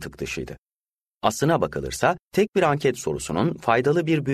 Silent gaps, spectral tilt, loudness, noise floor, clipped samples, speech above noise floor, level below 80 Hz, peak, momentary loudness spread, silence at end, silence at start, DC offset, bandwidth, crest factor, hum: 0.58-0.63 s, 0.77-0.81 s, 1.14-1.18 s, 2.22-2.26 s, 2.49-2.53 s; -5.5 dB/octave; -23 LUFS; under -90 dBFS; under 0.1%; over 67 dB; -50 dBFS; -4 dBFS; 10 LU; 0 s; 0 s; under 0.1%; 13.5 kHz; 18 dB; none